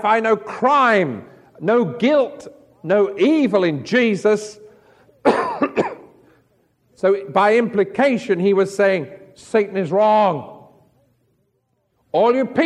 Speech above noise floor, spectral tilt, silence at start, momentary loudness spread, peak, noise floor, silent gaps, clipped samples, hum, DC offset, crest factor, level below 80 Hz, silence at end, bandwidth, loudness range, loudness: 51 dB; -6 dB/octave; 0 s; 10 LU; -2 dBFS; -68 dBFS; none; under 0.1%; none; under 0.1%; 18 dB; -66 dBFS; 0 s; 11 kHz; 4 LU; -18 LUFS